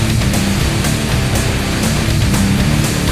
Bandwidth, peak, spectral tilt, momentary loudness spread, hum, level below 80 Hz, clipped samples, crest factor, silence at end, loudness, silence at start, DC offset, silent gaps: 15.5 kHz; 0 dBFS; -4.5 dB/octave; 2 LU; none; -22 dBFS; under 0.1%; 14 dB; 0 s; -15 LUFS; 0 s; under 0.1%; none